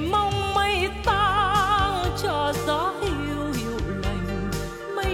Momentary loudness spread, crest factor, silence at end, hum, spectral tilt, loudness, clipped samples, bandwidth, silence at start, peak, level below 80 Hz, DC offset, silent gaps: 8 LU; 14 dB; 0 s; none; -5 dB/octave; -24 LUFS; under 0.1%; 17 kHz; 0 s; -10 dBFS; -36 dBFS; under 0.1%; none